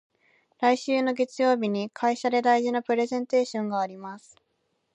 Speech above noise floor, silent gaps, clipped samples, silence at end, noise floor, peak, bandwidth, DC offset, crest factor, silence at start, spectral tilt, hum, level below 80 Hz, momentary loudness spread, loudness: 49 dB; none; under 0.1%; 0.75 s; -74 dBFS; -8 dBFS; 8.8 kHz; under 0.1%; 18 dB; 0.6 s; -5 dB/octave; none; -80 dBFS; 8 LU; -25 LUFS